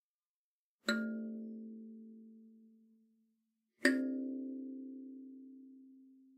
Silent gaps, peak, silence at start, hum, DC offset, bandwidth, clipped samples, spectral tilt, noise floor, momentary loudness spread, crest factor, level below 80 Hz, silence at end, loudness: none; -12 dBFS; 0.85 s; none; under 0.1%; 15 kHz; under 0.1%; -4 dB/octave; under -90 dBFS; 25 LU; 30 dB; under -90 dBFS; 0.05 s; -39 LUFS